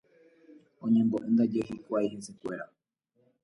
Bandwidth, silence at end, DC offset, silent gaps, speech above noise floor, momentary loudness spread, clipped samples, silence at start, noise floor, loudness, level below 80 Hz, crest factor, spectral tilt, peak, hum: 11.5 kHz; 0.8 s; under 0.1%; none; 43 dB; 14 LU; under 0.1%; 0.8 s; -72 dBFS; -30 LUFS; -70 dBFS; 16 dB; -7.5 dB/octave; -16 dBFS; none